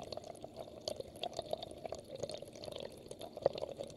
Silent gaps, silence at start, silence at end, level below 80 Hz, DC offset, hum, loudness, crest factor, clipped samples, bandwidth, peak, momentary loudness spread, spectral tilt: none; 0 s; 0 s; -68 dBFS; under 0.1%; none; -44 LUFS; 30 dB; under 0.1%; 15.5 kHz; -14 dBFS; 11 LU; -4 dB/octave